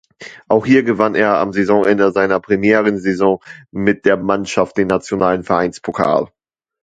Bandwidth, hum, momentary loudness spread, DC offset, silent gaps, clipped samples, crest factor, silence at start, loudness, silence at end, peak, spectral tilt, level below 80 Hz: 9.2 kHz; none; 6 LU; under 0.1%; none; under 0.1%; 16 dB; 0.2 s; -15 LUFS; 0.55 s; 0 dBFS; -6.5 dB/octave; -50 dBFS